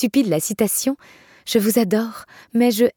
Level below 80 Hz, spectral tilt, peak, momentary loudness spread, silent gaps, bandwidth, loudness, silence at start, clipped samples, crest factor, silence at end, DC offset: -62 dBFS; -4.5 dB/octave; -4 dBFS; 14 LU; none; 19 kHz; -20 LUFS; 0 s; under 0.1%; 14 dB; 0.05 s; under 0.1%